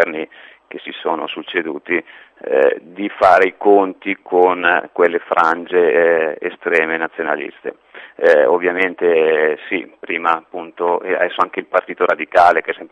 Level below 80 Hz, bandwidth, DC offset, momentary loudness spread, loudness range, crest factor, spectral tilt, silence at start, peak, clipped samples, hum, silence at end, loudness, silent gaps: -60 dBFS; 8.6 kHz; under 0.1%; 12 LU; 3 LU; 16 dB; -5.5 dB/octave; 0 s; 0 dBFS; under 0.1%; none; 0.05 s; -16 LUFS; none